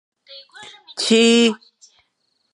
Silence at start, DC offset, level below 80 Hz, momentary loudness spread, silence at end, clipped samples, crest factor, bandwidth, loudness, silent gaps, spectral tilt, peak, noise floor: 0.3 s; under 0.1%; -72 dBFS; 26 LU; 1 s; under 0.1%; 18 dB; 11.5 kHz; -15 LUFS; none; -3 dB/octave; -4 dBFS; -70 dBFS